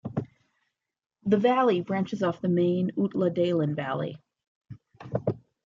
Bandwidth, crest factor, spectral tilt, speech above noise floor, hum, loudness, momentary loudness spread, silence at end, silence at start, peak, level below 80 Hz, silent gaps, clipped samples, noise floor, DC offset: 7.4 kHz; 18 dB; -8.5 dB/octave; 53 dB; none; -27 LUFS; 13 LU; 0.3 s; 0.05 s; -10 dBFS; -66 dBFS; 4.47-4.61 s; under 0.1%; -78 dBFS; under 0.1%